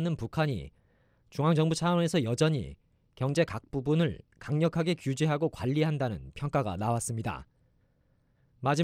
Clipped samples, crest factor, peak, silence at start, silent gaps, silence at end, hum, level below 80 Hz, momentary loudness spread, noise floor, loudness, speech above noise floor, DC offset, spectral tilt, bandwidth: under 0.1%; 18 dB; -12 dBFS; 0 s; none; 0 s; none; -56 dBFS; 10 LU; -69 dBFS; -30 LUFS; 40 dB; under 0.1%; -6 dB/octave; 14.5 kHz